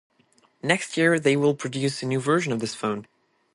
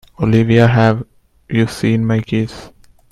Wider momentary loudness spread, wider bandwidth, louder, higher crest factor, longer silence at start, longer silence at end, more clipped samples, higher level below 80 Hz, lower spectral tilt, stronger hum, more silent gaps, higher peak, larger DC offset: second, 9 LU vs 13 LU; about the same, 11.5 kHz vs 12 kHz; second, -24 LUFS vs -15 LUFS; first, 20 dB vs 14 dB; first, 0.65 s vs 0.2 s; about the same, 0.5 s vs 0.45 s; neither; second, -68 dBFS vs -42 dBFS; second, -5 dB/octave vs -7.5 dB/octave; neither; neither; second, -4 dBFS vs 0 dBFS; neither